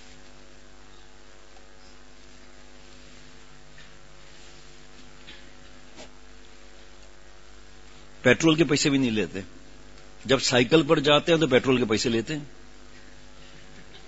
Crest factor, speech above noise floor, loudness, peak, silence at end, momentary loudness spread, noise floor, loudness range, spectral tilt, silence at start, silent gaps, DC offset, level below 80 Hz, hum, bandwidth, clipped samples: 24 dB; 30 dB; -22 LUFS; -4 dBFS; 0.1 s; 27 LU; -52 dBFS; 4 LU; -4.5 dB/octave; 5.25 s; none; 0.6%; -54 dBFS; none; 8 kHz; under 0.1%